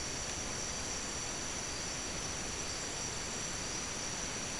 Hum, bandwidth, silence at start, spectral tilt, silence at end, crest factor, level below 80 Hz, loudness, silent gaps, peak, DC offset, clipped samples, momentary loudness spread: none; 12 kHz; 0 s; -1.5 dB/octave; 0 s; 14 dB; -52 dBFS; -37 LUFS; none; -26 dBFS; 0.2%; under 0.1%; 0 LU